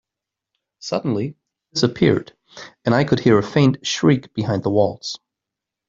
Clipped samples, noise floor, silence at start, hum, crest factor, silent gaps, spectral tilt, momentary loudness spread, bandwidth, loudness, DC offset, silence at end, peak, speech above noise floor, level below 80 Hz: under 0.1%; -85 dBFS; 0.85 s; none; 18 dB; none; -6 dB/octave; 14 LU; 7.8 kHz; -19 LUFS; under 0.1%; 0.7 s; -2 dBFS; 67 dB; -54 dBFS